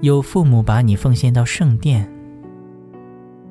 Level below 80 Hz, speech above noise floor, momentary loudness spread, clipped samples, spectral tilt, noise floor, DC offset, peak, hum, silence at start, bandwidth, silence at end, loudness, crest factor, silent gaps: -36 dBFS; 25 dB; 13 LU; under 0.1%; -7 dB/octave; -39 dBFS; under 0.1%; -4 dBFS; none; 0 s; 11 kHz; 0.35 s; -15 LUFS; 14 dB; none